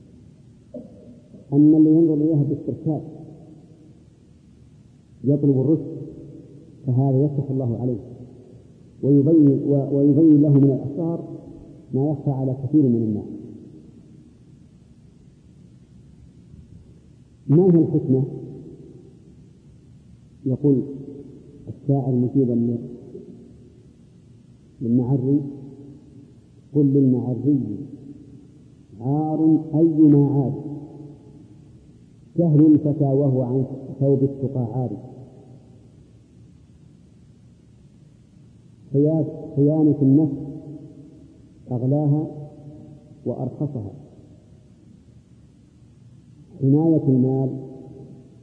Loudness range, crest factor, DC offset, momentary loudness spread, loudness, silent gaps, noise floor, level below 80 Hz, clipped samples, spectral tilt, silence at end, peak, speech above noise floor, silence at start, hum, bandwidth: 9 LU; 16 dB; under 0.1%; 25 LU; -20 LUFS; none; -50 dBFS; -58 dBFS; under 0.1%; -13 dB/octave; 0.2 s; -6 dBFS; 32 dB; 0.75 s; none; 1.4 kHz